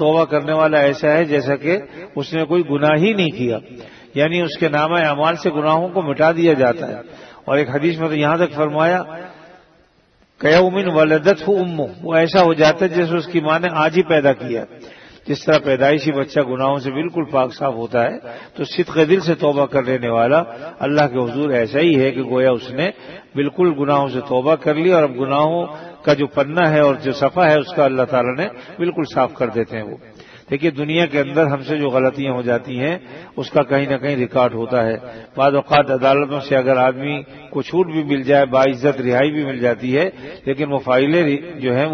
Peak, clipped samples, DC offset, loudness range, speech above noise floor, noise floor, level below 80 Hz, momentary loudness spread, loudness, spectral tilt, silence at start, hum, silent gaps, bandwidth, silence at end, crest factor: 0 dBFS; under 0.1%; under 0.1%; 3 LU; 39 dB; -56 dBFS; -56 dBFS; 10 LU; -17 LUFS; -7 dB/octave; 0 s; none; none; 6.6 kHz; 0 s; 16 dB